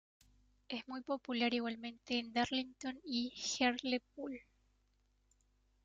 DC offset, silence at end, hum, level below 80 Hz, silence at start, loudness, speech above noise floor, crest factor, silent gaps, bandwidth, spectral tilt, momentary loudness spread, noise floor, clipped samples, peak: under 0.1%; 1.45 s; none; -74 dBFS; 0.7 s; -39 LUFS; 37 dB; 20 dB; none; 9 kHz; -2.5 dB/octave; 12 LU; -76 dBFS; under 0.1%; -20 dBFS